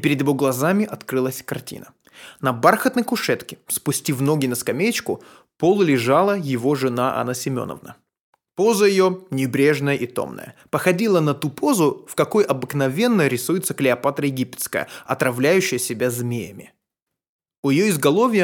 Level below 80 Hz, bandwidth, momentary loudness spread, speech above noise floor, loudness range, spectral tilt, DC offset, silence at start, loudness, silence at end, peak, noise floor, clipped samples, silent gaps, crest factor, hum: -66 dBFS; 19 kHz; 11 LU; 63 dB; 2 LU; -5 dB/octave; under 0.1%; 0 s; -20 LUFS; 0 s; -2 dBFS; -83 dBFS; under 0.1%; 8.19-8.33 s, 17.29-17.39 s, 17.58-17.63 s; 20 dB; none